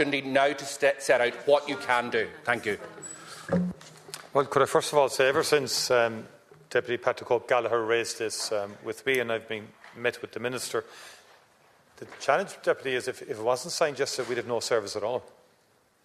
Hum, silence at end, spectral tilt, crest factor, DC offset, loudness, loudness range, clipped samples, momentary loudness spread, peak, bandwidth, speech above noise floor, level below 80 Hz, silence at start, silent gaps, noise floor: none; 0.8 s; -3.5 dB/octave; 20 dB; under 0.1%; -27 LUFS; 6 LU; under 0.1%; 13 LU; -8 dBFS; 14 kHz; 38 dB; -70 dBFS; 0 s; none; -65 dBFS